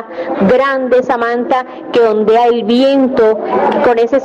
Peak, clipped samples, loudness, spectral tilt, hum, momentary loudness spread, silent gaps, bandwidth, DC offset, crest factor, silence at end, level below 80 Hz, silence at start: -4 dBFS; under 0.1%; -12 LUFS; -6.5 dB/octave; none; 5 LU; none; 8 kHz; under 0.1%; 8 dB; 0 s; -48 dBFS; 0 s